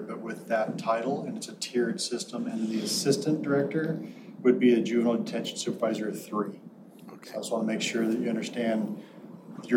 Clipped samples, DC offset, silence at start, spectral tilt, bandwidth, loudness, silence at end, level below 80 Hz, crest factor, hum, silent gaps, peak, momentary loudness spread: under 0.1%; under 0.1%; 0 s; -4.5 dB/octave; 16 kHz; -29 LUFS; 0 s; -82 dBFS; 20 dB; none; none; -10 dBFS; 16 LU